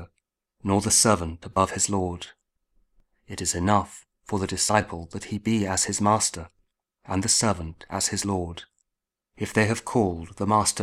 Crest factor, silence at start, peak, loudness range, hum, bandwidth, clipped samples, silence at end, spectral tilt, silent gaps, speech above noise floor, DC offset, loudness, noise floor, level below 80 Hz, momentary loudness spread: 22 dB; 0 s; -4 dBFS; 3 LU; none; 15.5 kHz; under 0.1%; 0 s; -3.5 dB/octave; none; 60 dB; under 0.1%; -24 LUFS; -85 dBFS; -50 dBFS; 15 LU